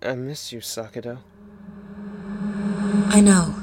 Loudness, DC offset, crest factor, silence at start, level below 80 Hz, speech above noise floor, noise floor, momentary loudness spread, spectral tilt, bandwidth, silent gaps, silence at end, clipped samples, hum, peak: -20 LUFS; under 0.1%; 20 dB; 0 s; -48 dBFS; 22 dB; -42 dBFS; 25 LU; -5 dB/octave; 16 kHz; none; 0 s; under 0.1%; none; -2 dBFS